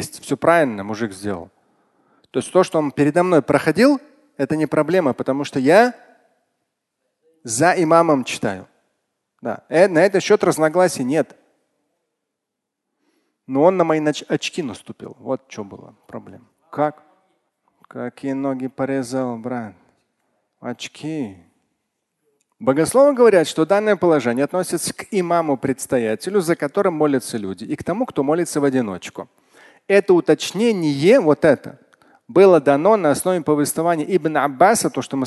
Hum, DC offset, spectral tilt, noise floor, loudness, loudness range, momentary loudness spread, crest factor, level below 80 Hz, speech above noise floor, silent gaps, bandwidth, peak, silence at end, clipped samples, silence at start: none; under 0.1%; -5 dB/octave; -80 dBFS; -18 LUFS; 11 LU; 16 LU; 18 dB; -60 dBFS; 63 dB; none; 12.5 kHz; 0 dBFS; 0 s; under 0.1%; 0 s